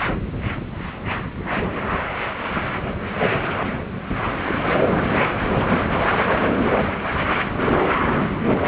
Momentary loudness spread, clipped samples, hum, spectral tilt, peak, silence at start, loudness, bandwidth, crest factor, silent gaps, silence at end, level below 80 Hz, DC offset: 8 LU; under 0.1%; none; -10 dB/octave; -6 dBFS; 0 s; -22 LUFS; 4 kHz; 16 dB; none; 0 s; -36 dBFS; under 0.1%